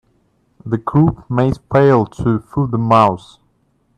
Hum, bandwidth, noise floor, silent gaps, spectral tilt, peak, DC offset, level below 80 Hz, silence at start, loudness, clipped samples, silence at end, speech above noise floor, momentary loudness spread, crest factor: none; 9.6 kHz; -60 dBFS; none; -9 dB/octave; 0 dBFS; under 0.1%; -42 dBFS; 0.65 s; -15 LUFS; under 0.1%; 0.8 s; 46 dB; 10 LU; 16 dB